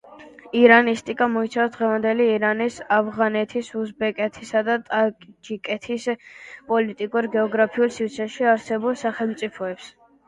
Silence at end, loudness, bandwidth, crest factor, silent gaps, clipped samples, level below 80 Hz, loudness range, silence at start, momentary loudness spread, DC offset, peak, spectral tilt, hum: 0.4 s; -22 LUFS; 10.5 kHz; 22 dB; none; under 0.1%; -66 dBFS; 6 LU; 0.1 s; 10 LU; under 0.1%; 0 dBFS; -5 dB/octave; none